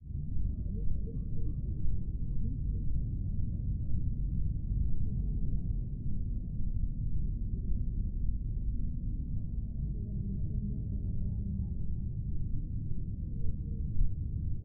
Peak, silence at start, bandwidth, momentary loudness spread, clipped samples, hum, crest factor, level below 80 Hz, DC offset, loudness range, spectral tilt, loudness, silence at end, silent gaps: -18 dBFS; 0 s; 0.7 kHz; 3 LU; under 0.1%; none; 14 dB; -34 dBFS; under 0.1%; 2 LU; -20 dB/octave; -37 LUFS; 0 s; none